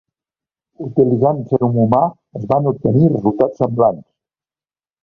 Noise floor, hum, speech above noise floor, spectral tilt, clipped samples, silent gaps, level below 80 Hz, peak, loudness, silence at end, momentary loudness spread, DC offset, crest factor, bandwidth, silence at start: under -90 dBFS; none; over 75 dB; -12 dB/octave; under 0.1%; none; -52 dBFS; -2 dBFS; -16 LUFS; 1.05 s; 7 LU; under 0.1%; 16 dB; 4.5 kHz; 0.8 s